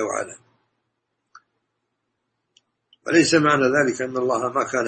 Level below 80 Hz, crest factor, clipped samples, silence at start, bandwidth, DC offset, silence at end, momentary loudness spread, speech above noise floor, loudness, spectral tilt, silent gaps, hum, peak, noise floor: -64 dBFS; 20 dB; under 0.1%; 0 s; 8.8 kHz; under 0.1%; 0 s; 12 LU; 56 dB; -20 LUFS; -4 dB/octave; none; none; -4 dBFS; -76 dBFS